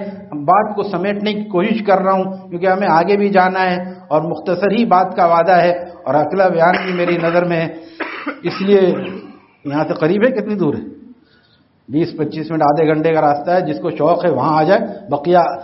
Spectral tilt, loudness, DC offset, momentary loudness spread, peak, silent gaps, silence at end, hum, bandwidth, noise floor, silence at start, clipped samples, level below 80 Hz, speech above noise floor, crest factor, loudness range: -5 dB/octave; -15 LUFS; under 0.1%; 10 LU; 0 dBFS; none; 0 s; none; 6 kHz; -54 dBFS; 0 s; under 0.1%; -58 dBFS; 39 dB; 16 dB; 4 LU